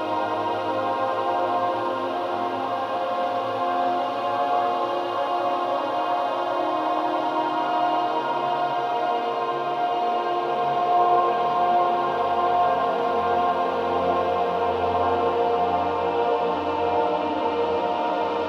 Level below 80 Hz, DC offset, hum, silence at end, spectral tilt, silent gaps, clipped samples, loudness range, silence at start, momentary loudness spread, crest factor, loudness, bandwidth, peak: -62 dBFS; under 0.1%; none; 0 s; -6 dB/octave; none; under 0.1%; 3 LU; 0 s; 4 LU; 14 dB; -23 LUFS; 7.4 kHz; -10 dBFS